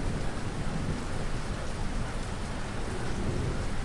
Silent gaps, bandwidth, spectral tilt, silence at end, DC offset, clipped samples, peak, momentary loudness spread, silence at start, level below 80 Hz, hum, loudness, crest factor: none; 11.5 kHz; -5.5 dB/octave; 0 s; under 0.1%; under 0.1%; -18 dBFS; 3 LU; 0 s; -36 dBFS; none; -35 LUFS; 12 dB